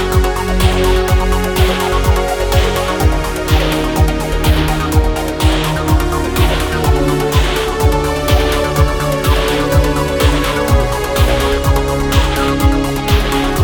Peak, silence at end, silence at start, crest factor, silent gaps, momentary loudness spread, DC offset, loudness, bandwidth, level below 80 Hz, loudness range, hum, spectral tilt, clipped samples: 0 dBFS; 0 s; 0 s; 12 dB; none; 2 LU; under 0.1%; -14 LUFS; 19.5 kHz; -16 dBFS; 1 LU; none; -5.5 dB/octave; under 0.1%